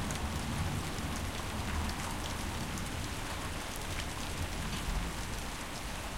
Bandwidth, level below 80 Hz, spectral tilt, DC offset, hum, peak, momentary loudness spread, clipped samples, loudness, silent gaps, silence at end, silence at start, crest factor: 17 kHz; -42 dBFS; -4 dB/octave; 0.3%; none; -20 dBFS; 3 LU; under 0.1%; -38 LUFS; none; 0 s; 0 s; 18 dB